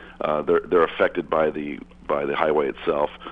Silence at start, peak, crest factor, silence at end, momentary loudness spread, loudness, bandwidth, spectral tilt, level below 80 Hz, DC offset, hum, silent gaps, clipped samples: 0 s; -2 dBFS; 20 dB; 0 s; 8 LU; -23 LUFS; 4.9 kHz; -7.5 dB/octave; -52 dBFS; under 0.1%; none; none; under 0.1%